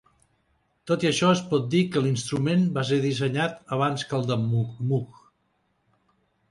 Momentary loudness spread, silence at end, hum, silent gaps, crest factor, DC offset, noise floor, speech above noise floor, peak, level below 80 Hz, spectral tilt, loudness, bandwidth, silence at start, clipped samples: 6 LU; 1.4 s; none; none; 18 dB; under 0.1%; -71 dBFS; 47 dB; -8 dBFS; -62 dBFS; -6 dB/octave; -25 LUFS; 11.5 kHz; 0.85 s; under 0.1%